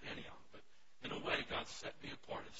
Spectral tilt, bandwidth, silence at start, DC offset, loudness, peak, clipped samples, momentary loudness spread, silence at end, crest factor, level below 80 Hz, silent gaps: -1.5 dB/octave; 7.6 kHz; 0 s; 0.2%; -44 LUFS; -24 dBFS; under 0.1%; 21 LU; 0 s; 24 dB; -66 dBFS; none